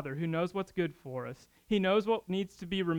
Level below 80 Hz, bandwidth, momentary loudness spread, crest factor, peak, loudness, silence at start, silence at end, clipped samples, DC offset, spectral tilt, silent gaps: -62 dBFS; 18 kHz; 13 LU; 16 dB; -16 dBFS; -33 LUFS; 0 s; 0 s; under 0.1%; under 0.1%; -7 dB/octave; none